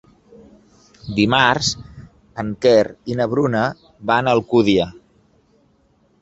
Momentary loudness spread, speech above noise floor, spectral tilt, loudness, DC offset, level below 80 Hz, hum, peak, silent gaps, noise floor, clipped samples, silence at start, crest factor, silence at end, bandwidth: 14 LU; 42 dB; -5 dB/octave; -18 LUFS; under 0.1%; -48 dBFS; none; 0 dBFS; none; -59 dBFS; under 0.1%; 1.05 s; 18 dB; 1.3 s; 8.2 kHz